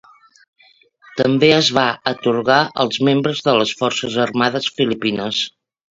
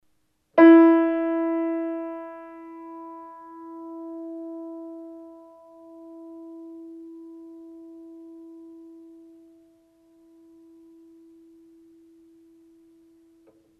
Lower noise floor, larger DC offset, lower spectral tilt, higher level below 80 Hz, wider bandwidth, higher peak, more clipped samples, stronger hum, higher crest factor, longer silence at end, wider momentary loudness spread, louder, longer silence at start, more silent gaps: second, -52 dBFS vs -71 dBFS; neither; second, -4.5 dB/octave vs -7 dB/octave; first, -58 dBFS vs -70 dBFS; first, 7.8 kHz vs 3.6 kHz; first, 0 dBFS vs -4 dBFS; neither; neither; about the same, 18 dB vs 22 dB; second, 0.45 s vs 6.75 s; second, 7 LU vs 29 LU; about the same, -17 LUFS vs -19 LUFS; first, 1.15 s vs 0.55 s; neither